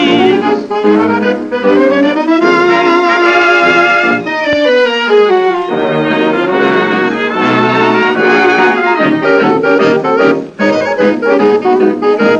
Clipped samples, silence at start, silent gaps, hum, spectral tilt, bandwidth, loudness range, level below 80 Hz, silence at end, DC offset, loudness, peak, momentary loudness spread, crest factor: under 0.1%; 0 s; none; none; -5.5 dB/octave; 8.4 kHz; 2 LU; -56 dBFS; 0 s; under 0.1%; -9 LUFS; 0 dBFS; 5 LU; 10 dB